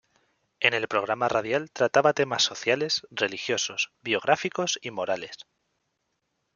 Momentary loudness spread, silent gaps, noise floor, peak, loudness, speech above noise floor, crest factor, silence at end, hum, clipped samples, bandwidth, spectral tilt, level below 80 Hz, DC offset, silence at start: 8 LU; none; -78 dBFS; -4 dBFS; -26 LUFS; 51 dB; 24 dB; 1.15 s; none; under 0.1%; 7.4 kHz; -2.5 dB/octave; -72 dBFS; under 0.1%; 0.6 s